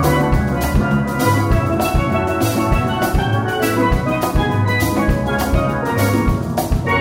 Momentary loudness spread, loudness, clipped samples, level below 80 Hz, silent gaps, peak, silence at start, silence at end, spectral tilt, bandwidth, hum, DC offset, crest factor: 2 LU; -17 LUFS; under 0.1%; -24 dBFS; none; -2 dBFS; 0 s; 0 s; -6 dB/octave; 16.5 kHz; none; under 0.1%; 14 dB